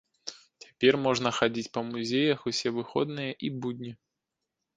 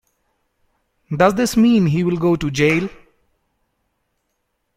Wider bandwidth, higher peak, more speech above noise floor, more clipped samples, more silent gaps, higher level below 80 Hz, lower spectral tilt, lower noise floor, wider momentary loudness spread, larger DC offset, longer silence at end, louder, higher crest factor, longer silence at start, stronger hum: second, 9.6 kHz vs 15.5 kHz; second, -6 dBFS vs -2 dBFS; about the same, 57 dB vs 56 dB; neither; neither; second, -68 dBFS vs -48 dBFS; second, -4.5 dB/octave vs -6 dB/octave; first, -86 dBFS vs -72 dBFS; first, 16 LU vs 7 LU; neither; second, 0.85 s vs 1.85 s; second, -28 LUFS vs -16 LUFS; first, 24 dB vs 18 dB; second, 0.25 s vs 1.1 s; neither